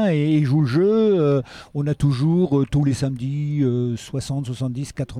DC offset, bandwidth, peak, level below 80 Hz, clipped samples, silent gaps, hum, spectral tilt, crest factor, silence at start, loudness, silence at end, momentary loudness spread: under 0.1%; 11 kHz; -8 dBFS; -46 dBFS; under 0.1%; none; none; -8 dB/octave; 12 dB; 0 s; -21 LUFS; 0 s; 9 LU